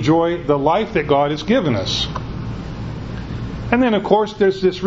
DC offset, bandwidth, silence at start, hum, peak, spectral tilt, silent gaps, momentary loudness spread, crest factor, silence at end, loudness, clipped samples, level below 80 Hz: under 0.1%; 8 kHz; 0 s; none; 0 dBFS; -6 dB/octave; none; 12 LU; 18 dB; 0 s; -19 LUFS; under 0.1%; -36 dBFS